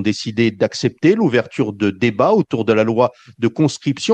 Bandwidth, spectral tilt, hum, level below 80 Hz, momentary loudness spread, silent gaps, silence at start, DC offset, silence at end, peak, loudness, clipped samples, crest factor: 9.2 kHz; -6 dB/octave; none; -58 dBFS; 6 LU; none; 0 s; under 0.1%; 0 s; -2 dBFS; -17 LUFS; under 0.1%; 16 dB